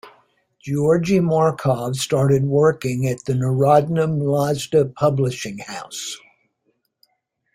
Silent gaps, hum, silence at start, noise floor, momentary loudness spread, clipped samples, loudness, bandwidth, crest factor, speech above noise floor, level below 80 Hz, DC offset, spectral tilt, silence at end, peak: none; none; 0.05 s; -70 dBFS; 13 LU; under 0.1%; -19 LUFS; 16 kHz; 18 dB; 52 dB; -54 dBFS; under 0.1%; -6.5 dB/octave; 1.4 s; -2 dBFS